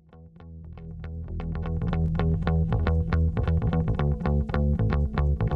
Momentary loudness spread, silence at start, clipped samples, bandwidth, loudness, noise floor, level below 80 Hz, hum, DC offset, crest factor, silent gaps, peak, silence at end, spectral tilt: 15 LU; 0.15 s; under 0.1%; 4.9 kHz; -26 LUFS; -47 dBFS; -30 dBFS; none; under 0.1%; 16 dB; none; -8 dBFS; 0 s; -10 dB/octave